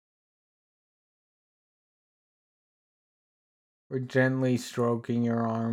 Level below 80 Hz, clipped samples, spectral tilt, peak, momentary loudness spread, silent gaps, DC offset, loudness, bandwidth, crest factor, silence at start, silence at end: -80 dBFS; under 0.1%; -7 dB/octave; -12 dBFS; 6 LU; none; under 0.1%; -28 LUFS; 15 kHz; 20 dB; 3.9 s; 0 s